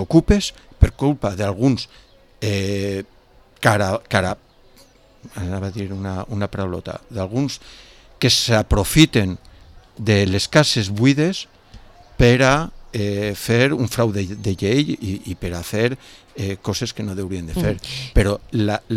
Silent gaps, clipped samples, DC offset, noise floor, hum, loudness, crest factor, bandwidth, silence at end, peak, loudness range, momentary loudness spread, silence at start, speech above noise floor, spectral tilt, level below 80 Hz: none; under 0.1%; under 0.1%; -50 dBFS; none; -20 LUFS; 20 dB; 16 kHz; 0 s; 0 dBFS; 7 LU; 13 LU; 0 s; 31 dB; -5 dB/octave; -32 dBFS